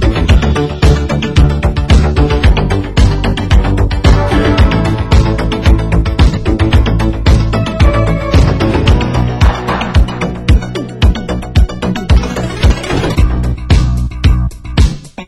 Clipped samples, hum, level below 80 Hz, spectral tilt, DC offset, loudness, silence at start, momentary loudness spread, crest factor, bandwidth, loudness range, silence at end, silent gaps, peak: 0.1%; none; -12 dBFS; -6.5 dB/octave; under 0.1%; -12 LUFS; 0 s; 4 LU; 10 dB; 11.5 kHz; 2 LU; 0 s; none; 0 dBFS